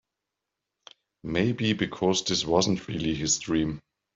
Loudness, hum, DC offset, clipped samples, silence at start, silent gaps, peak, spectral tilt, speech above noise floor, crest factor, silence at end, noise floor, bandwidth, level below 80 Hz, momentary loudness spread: -26 LUFS; none; under 0.1%; under 0.1%; 1.25 s; none; -8 dBFS; -4 dB/octave; 59 dB; 20 dB; 0.35 s; -86 dBFS; 7.8 kHz; -54 dBFS; 7 LU